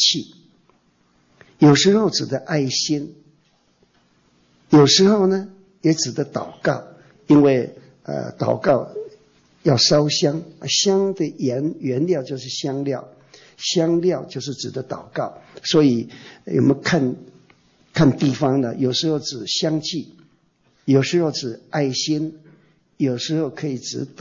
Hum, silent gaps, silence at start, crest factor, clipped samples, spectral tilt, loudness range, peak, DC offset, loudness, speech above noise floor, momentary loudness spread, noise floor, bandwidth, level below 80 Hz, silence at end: none; none; 0 s; 16 dB; under 0.1%; -5 dB/octave; 4 LU; -4 dBFS; under 0.1%; -20 LUFS; 42 dB; 15 LU; -61 dBFS; 7.6 kHz; -60 dBFS; 0 s